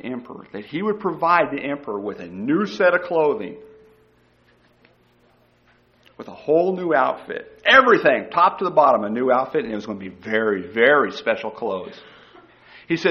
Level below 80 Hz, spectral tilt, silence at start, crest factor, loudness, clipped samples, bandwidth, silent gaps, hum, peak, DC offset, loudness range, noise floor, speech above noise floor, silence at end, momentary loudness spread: -62 dBFS; -6 dB/octave; 0.05 s; 20 dB; -19 LUFS; under 0.1%; 6.8 kHz; none; 60 Hz at -60 dBFS; -2 dBFS; under 0.1%; 8 LU; -58 dBFS; 38 dB; 0 s; 17 LU